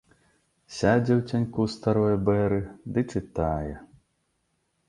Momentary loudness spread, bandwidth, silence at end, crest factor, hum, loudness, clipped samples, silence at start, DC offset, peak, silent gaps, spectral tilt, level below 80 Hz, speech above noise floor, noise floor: 9 LU; 11 kHz; 1.05 s; 18 dB; none; -26 LUFS; under 0.1%; 0.7 s; under 0.1%; -8 dBFS; none; -7.5 dB/octave; -46 dBFS; 49 dB; -74 dBFS